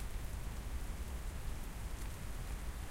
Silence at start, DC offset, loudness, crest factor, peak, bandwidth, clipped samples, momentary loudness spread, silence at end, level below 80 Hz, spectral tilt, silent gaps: 0 s; under 0.1%; -46 LUFS; 12 dB; -30 dBFS; 16.5 kHz; under 0.1%; 1 LU; 0 s; -44 dBFS; -4.5 dB/octave; none